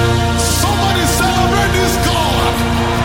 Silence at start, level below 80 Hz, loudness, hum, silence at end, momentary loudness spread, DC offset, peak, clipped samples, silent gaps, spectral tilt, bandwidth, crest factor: 0 s; -24 dBFS; -14 LUFS; none; 0 s; 2 LU; under 0.1%; -2 dBFS; under 0.1%; none; -4 dB/octave; 16.5 kHz; 12 dB